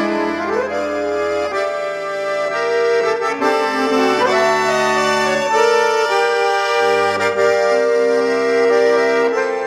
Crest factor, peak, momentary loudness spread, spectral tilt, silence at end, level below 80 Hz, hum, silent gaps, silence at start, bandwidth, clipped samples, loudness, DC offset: 14 dB; -2 dBFS; 6 LU; -3 dB/octave; 0 s; -56 dBFS; none; none; 0 s; 14 kHz; under 0.1%; -16 LUFS; under 0.1%